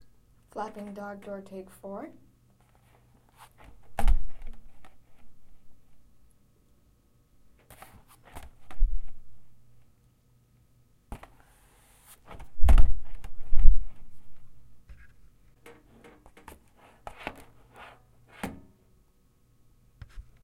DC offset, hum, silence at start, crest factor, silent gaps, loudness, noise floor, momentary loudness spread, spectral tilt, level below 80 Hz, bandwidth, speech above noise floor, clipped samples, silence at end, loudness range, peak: under 0.1%; none; 0.55 s; 24 dB; none; -34 LUFS; -63 dBFS; 27 LU; -6.5 dB/octave; -30 dBFS; 3.3 kHz; 24 dB; under 0.1%; 1.95 s; 22 LU; 0 dBFS